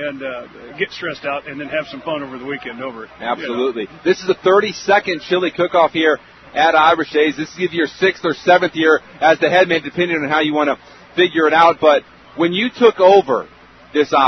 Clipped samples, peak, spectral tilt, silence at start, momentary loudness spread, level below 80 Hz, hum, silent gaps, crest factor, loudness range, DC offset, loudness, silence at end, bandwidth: under 0.1%; 0 dBFS; -5 dB/octave; 0 s; 14 LU; -56 dBFS; none; none; 16 dB; 9 LU; under 0.1%; -16 LUFS; 0 s; 6.4 kHz